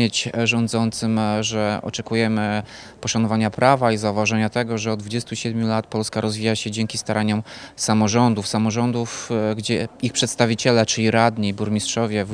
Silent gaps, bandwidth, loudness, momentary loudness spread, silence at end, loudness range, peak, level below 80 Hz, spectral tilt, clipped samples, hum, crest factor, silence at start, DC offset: none; 10.5 kHz; -21 LUFS; 7 LU; 0 s; 3 LU; 0 dBFS; -56 dBFS; -4.5 dB/octave; under 0.1%; none; 20 dB; 0 s; under 0.1%